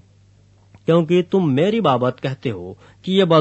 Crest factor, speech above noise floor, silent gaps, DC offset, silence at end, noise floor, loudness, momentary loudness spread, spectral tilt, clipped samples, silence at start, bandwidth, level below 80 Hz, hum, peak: 18 dB; 34 dB; none; under 0.1%; 0 s; -52 dBFS; -18 LUFS; 14 LU; -7.5 dB/octave; under 0.1%; 0.9 s; 8.2 kHz; -60 dBFS; 50 Hz at -45 dBFS; -2 dBFS